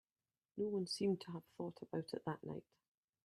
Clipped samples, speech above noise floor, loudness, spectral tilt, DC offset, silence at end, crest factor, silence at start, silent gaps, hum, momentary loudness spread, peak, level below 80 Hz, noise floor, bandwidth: under 0.1%; over 47 dB; -44 LUFS; -6 dB/octave; under 0.1%; 0.65 s; 18 dB; 0.55 s; none; none; 12 LU; -28 dBFS; -84 dBFS; under -90 dBFS; 13.5 kHz